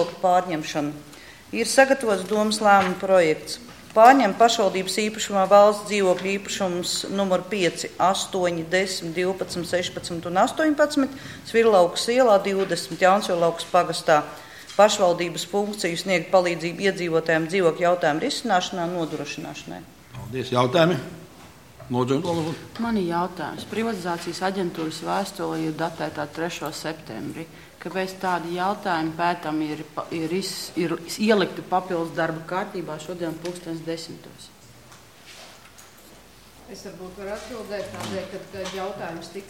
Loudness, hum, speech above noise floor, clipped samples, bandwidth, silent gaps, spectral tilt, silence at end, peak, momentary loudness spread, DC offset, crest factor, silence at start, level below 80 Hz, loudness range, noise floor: -23 LUFS; none; 26 dB; under 0.1%; 16.5 kHz; none; -4 dB/octave; 0 s; 0 dBFS; 16 LU; 0.1%; 24 dB; 0 s; -60 dBFS; 15 LU; -49 dBFS